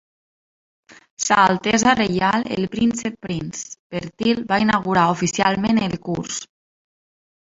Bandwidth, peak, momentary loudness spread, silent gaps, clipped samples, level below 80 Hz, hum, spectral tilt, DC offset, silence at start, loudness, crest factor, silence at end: 8 kHz; -2 dBFS; 13 LU; 3.79-3.90 s; under 0.1%; -52 dBFS; none; -4 dB/octave; under 0.1%; 1.2 s; -20 LUFS; 20 dB; 1.15 s